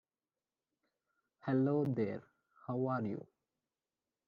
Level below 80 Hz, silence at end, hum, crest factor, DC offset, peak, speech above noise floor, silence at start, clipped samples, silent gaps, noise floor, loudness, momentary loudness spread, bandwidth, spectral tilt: -82 dBFS; 1 s; none; 18 dB; under 0.1%; -22 dBFS; over 55 dB; 1.45 s; under 0.1%; none; under -90 dBFS; -37 LUFS; 15 LU; 5.2 kHz; -9 dB/octave